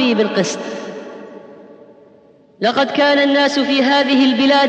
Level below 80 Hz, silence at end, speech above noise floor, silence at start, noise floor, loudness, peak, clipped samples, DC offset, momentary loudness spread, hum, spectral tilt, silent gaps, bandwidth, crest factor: -70 dBFS; 0 s; 34 dB; 0 s; -48 dBFS; -14 LUFS; -2 dBFS; under 0.1%; under 0.1%; 19 LU; none; -4 dB/octave; none; 8.6 kHz; 14 dB